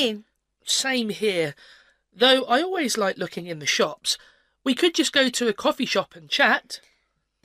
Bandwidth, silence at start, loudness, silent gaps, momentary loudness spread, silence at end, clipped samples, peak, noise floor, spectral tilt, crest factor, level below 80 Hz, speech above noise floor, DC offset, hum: 15.5 kHz; 0 s; -22 LUFS; none; 11 LU; 0.65 s; under 0.1%; -4 dBFS; -72 dBFS; -2 dB/octave; 20 dB; -68 dBFS; 48 dB; under 0.1%; none